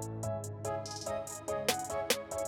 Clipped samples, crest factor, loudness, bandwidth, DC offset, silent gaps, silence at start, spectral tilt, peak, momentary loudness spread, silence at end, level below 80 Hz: under 0.1%; 24 dB; -36 LUFS; 19.5 kHz; under 0.1%; none; 0 s; -3 dB/octave; -12 dBFS; 6 LU; 0 s; -62 dBFS